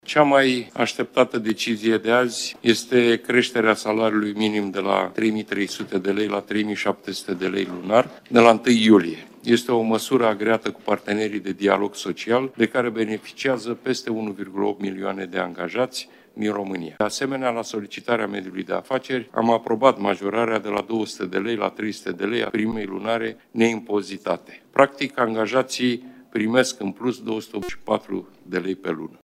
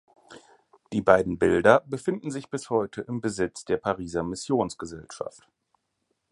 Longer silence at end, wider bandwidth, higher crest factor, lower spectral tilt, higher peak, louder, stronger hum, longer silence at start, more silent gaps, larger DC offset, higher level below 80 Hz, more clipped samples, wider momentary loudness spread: second, 0.25 s vs 1.05 s; first, 15.5 kHz vs 11.5 kHz; about the same, 22 dB vs 24 dB; about the same, -4.5 dB/octave vs -5.5 dB/octave; about the same, 0 dBFS vs -2 dBFS; first, -22 LUFS vs -25 LUFS; neither; second, 0.1 s vs 0.3 s; neither; neither; second, -64 dBFS vs -54 dBFS; neither; second, 10 LU vs 17 LU